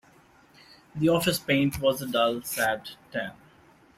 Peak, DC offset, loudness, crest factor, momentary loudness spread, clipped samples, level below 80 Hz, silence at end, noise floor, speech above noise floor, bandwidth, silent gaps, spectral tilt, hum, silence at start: -10 dBFS; under 0.1%; -26 LUFS; 18 dB; 12 LU; under 0.1%; -56 dBFS; 0.65 s; -57 dBFS; 31 dB; 16 kHz; none; -4.5 dB/octave; none; 0.95 s